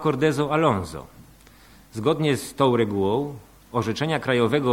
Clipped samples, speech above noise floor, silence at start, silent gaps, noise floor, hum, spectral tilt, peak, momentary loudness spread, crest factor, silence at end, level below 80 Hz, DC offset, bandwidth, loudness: under 0.1%; 28 dB; 0 s; none; -50 dBFS; none; -6 dB/octave; -6 dBFS; 14 LU; 18 dB; 0 s; -54 dBFS; under 0.1%; 16.5 kHz; -23 LUFS